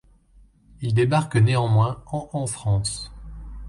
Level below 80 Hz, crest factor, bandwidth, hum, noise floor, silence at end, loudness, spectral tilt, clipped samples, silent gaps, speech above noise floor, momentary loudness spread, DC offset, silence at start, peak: -42 dBFS; 16 dB; 11.5 kHz; none; -54 dBFS; 0 s; -23 LUFS; -6 dB/octave; under 0.1%; none; 33 dB; 16 LU; under 0.1%; 0.8 s; -8 dBFS